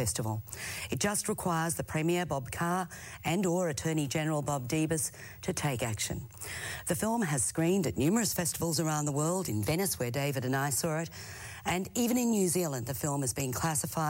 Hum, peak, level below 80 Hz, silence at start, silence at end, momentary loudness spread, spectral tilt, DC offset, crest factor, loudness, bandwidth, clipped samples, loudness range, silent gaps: none; -16 dBFS; -56 dBFS; 0 s; 0 s; 8 LU; -4.5 dB/octave; under 0.1%; 16 dB; -31 LUFS; 16.5 kHz; under 0.1%; 3 LU; none